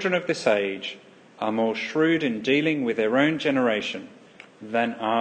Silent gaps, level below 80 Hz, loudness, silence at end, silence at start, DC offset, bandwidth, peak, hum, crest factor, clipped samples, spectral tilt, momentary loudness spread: none; -74 dBFS; -24 LUFS; 0 s; 0 s; under 0.1%; 9.2 kHz; -6 dBFS; none; 18 dB; under 0.1%; -5.5 dB/octave; 11 LU